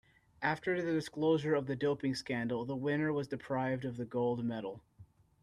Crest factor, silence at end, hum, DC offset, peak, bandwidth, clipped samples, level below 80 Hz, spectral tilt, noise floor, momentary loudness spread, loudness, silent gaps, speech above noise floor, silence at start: 18 dB; 0.4 s; none; under 0.1%; -16 dBFS; 12.5 kHz; under 0.1%; -70 dBFS; -6.5 dB/octave; -61 dBFS; 7 LU; -35 LUFS; none; 26 dB; 0.4 s